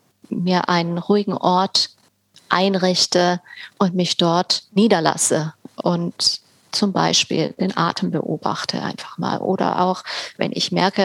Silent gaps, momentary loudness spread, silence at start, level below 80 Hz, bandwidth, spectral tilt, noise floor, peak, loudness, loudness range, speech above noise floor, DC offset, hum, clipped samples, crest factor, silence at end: none; 9 LU; 0.3 s; -66 dBFS; 14.5 kHz; -4 dB/octave; -54 dBFS; 0 dBFS; -19 LUFS; 4 LU; 35 dB; under 0.1%; none; under 0.1%; 20 dB; 0 s